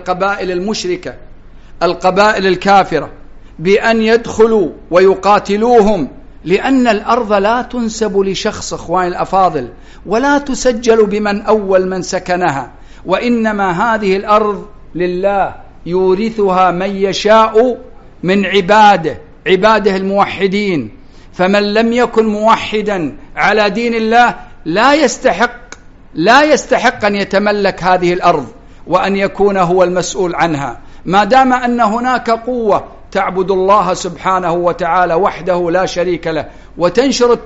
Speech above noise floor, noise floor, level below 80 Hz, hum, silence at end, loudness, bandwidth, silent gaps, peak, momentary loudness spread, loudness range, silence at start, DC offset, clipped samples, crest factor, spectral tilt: 23 dB; -35 dBFS; -36 dBFS; none; 0 s; -12 LUFS; 8 kHz; none; 0 dBFS; 10 LU; 3 LU; 0 s; under 0.1%; under 0.1%; 12 dB; -3.5 dB/octave